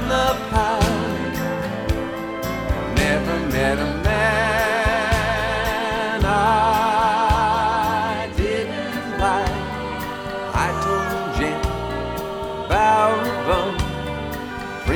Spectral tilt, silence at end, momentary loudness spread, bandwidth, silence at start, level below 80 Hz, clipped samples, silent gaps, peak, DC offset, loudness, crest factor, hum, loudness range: -5 dB/octave; 0 s; 10 LU; over 20 kHz; 0 s; -30 dBFS; under 0.1%; none; -4 dBFS; under 0.1%; -21 LUFS; 16 dB; none; 4 LU